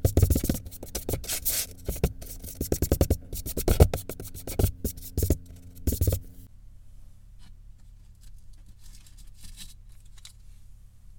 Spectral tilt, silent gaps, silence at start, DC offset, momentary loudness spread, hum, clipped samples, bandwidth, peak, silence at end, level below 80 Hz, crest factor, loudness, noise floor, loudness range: -5.5 dB/octave; none; 0 s; under 0.1%; 25 LU; none; under 0.1%; 17 kHz; -2 dBFS; 0.05 s; -34 dBFS; 28 dB; -29 LUFS; -49 dBFS; 23 LU